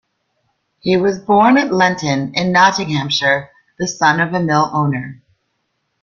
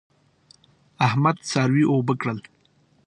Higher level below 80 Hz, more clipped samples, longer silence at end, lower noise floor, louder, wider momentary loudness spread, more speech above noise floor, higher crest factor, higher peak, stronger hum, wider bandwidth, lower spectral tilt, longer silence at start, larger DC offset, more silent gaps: first, -54 dBFS vs -64 dBFS; neither; first, 0.85 s vs 0.65 s; first, -69 dBFS vs -61 dBFS; first, -15 LUFS vs -22 LUFS; about the same, 10 LU vs 8 LU; first, 55 dB vs 40 dB; about the same, 16 dB vs 20 dB; first, 0 dBFS vs -4 dBFS; neither; second, 7.4 kHz vs 11 kHz; about the same, -5 dB/octave vs -6 dB/octave; second, 0.85 s vs 1 s; neither; neither